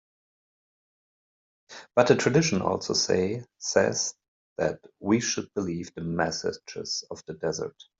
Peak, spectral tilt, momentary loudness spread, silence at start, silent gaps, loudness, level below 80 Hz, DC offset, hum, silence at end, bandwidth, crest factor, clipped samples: -4 dBFS; -4 dB/octave; 12 LU; 1.7 s; 4.28-4.56 s; -27 LUFS; -64 dBFS; under 0.1%; none; 0.3 s; 8 kHz; 24 dB; under 0.1%